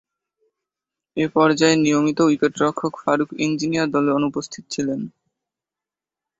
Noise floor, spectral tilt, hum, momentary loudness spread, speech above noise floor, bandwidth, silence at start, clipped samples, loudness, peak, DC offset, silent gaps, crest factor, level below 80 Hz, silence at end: -89 dBFS; -5 dB/octave; none; 13 LU; 69 dB; 8 kHz; 1.15 s; under 0.1%; -20 LUFS; -2 dBFS; under 0.1%; none; 20 dB; -62 dBFS; 1.3 s